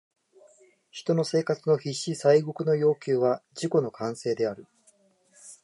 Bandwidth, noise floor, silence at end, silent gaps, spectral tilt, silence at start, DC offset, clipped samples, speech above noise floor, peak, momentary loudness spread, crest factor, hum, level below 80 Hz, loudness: 11.5 kHz; -63 dBFS; 0.1 s; none; -6 dB/octave; 0.95 s; under 0.1%; under 0.1%; 38 dB; -8 dBFS; 10 LU; 18 dB; none; -76 dBFS; -26 LUFS